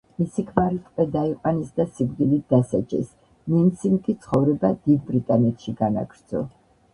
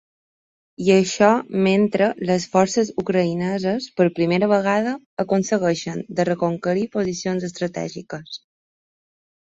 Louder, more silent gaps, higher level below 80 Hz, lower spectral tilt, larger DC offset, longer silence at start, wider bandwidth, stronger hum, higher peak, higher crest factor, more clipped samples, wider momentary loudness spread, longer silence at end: second, -23 LUFS vs -20 LUFS; second, none vs 5.06-5.17 s; first, -52 dBFS vs -60 dBFS; first, -9.5 dB/octave vs -5.5 dB/octave; neither; second, 0.2 s vs 0.8 s; first, 11 kHz vs 8 kHz; neither; about the same, -2 dBFS vs -2 dBFS; about the same, 20 dB vs 18 dB; neither; about the same, 9 LU vs 10 LU; second, 0.45 s vs 1.15 s